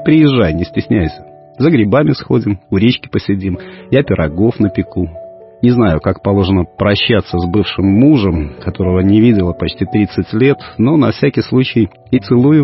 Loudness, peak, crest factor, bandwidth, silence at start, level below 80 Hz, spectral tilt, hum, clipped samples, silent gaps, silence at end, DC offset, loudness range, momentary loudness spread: -13 LUFS; 0 dBFS; 12 dB; 5.8 kHz; 0 s; -34 dBFS; -11 dB/octave; none; under 0.1%; none; 0 s; under 0.1%; 3 LU; 9 LU